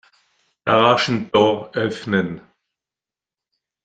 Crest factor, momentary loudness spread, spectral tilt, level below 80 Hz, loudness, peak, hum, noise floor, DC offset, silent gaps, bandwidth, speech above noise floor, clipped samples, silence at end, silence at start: 20 dB; 13 LU; -5.5 dB/octave; -60 dBFS; -19 LUFS; -2 dBFS; none; -90 dBFS; under 0.1%; none; 9.2 kHz; 72 dB; under 0.1%; 1.45 s; 0.65 s